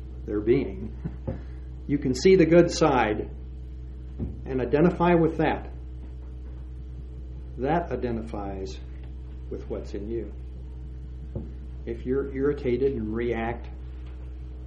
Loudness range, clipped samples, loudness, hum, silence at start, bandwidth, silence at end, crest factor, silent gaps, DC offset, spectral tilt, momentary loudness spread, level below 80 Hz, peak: 11 LU; under 0.1%; -26 LUFS; none; 0 s; 10 kHz; 0 s; 22 dB; none; under 0.1%; -7 dB/octave; 19 LU; -38 dBFS; -6 dBFS